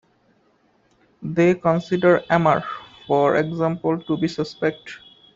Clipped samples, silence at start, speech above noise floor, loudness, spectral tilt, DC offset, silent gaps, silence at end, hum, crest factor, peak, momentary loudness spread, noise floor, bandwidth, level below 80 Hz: under 0.1%; 1.2 s; 42 dB; -20 LUFS; -7.5 dB/octave; under 0.1%; none; 0.4 s; none; 18 dB; -2 dBFS; 18 LU; -61 dBFS; 7.6 kHz; -58 dBFS